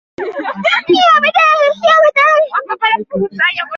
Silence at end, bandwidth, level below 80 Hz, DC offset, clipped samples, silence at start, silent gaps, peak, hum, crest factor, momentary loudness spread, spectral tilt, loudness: 0 s; 7.4 kHz; -60 dBFS; under 0.1%; under 0.1%; 0.2 s; none; 0 dBFS; none; 12 dB; 10 LU; -4 dB/octave; -11 LUFS